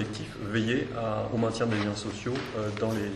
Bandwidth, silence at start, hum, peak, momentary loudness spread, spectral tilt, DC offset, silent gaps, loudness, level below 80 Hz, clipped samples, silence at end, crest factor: 12.5 kHz; 0 s; none; -14 dBFS; 5 LU; -6 dB/octave; under 0.1%; none; -30 LUFS; -54 dBFS; under 0.1%; 0 s; 16 dB